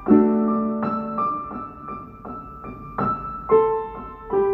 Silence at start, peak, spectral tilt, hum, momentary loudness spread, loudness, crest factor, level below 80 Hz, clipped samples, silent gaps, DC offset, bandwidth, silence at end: 0 s; -4 dBFS; -11.5 dB/octave; none; 17 LU; -22 LUFS; 20 dB; -48 dBFS; under 0.1%; none; under 0.1%; 4.3 kHz; 0 s